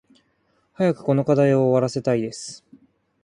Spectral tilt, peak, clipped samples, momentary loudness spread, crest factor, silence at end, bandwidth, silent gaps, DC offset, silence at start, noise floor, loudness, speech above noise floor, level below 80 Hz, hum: -7 dB/octave; -6 dBFS; under 0.1%; 14 LU; 16 dB; 0.7 s; 11 kHz; none; under 0.1%; 0.8 s; -66 dBFS; -21 LUFS; 46 dB; -64 dBFS; none